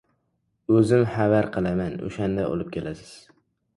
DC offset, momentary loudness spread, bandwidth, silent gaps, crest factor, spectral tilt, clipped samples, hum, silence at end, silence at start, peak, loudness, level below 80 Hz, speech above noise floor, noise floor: under 0.1%; 15 LU; 11.5 kHz; none; 18 dB; -8 dB/octave; under 0.1%; none; 0.6 s; 0.7 s; -6 dBFS; -23 LUFS; -50 dBFS; 50 dB; -73 dBFS